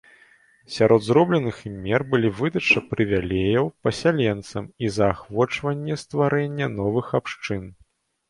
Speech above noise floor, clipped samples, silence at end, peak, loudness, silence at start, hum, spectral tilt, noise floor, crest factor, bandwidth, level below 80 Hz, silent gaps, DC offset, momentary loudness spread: 34 dB; under 0.1%; 0.55 s; -4 dBFS; -22 LUFS; 0.7 s; none; -6.5 dB/octave; -56 dBFS; 20 dB; 11.5 kHz; -48 dBFS; none; under 0.1%; 11 LU